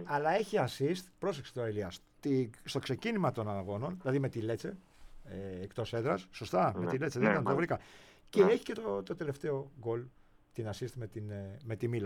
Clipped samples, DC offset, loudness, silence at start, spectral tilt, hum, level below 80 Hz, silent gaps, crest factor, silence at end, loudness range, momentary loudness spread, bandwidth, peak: under 0.1%; under 0.1%; -35 LUFS; 0 s; -6.5 dB/octave; none; -64 dBFS; none; 22 dB; 0 s; 5 LU; 13 LU; 16 kHz; -14 dBFS